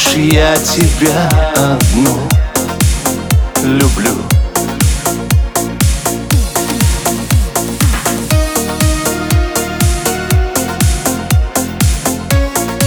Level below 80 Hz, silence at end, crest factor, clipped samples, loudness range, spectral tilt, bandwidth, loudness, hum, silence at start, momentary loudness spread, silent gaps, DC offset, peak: -18 dBFS; 0 s; 12 dB; under 0.1%; 2 LU; -4.5 dB/octave; over 20 kHz; -13 LUFS; none; 0 s; 5 LU; none; under 0.1%; 0 dBFS